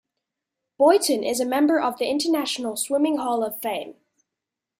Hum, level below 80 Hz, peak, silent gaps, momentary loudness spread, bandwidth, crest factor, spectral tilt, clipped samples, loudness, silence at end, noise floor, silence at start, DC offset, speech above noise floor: none; -70 dBFS; -6 dBFS; none; 10 LU; 16 kHz; 18 dB; -2.5 dB/octave; under 0.1%; -22 LUFS; 0.9 s; -86 dBFS; 0.8 s; under 0.1%; 64 dB